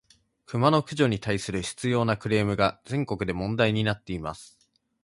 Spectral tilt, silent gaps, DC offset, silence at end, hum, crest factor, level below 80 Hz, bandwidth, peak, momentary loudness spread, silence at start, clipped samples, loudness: -6 dB/octave; none; under 0.1%; 0.55 s; none; 22 dB; -50 dBFS; 11.5 kHz; -6 dBFS; 11 LU; 0.5 s; under 0.1%; -26 LUFS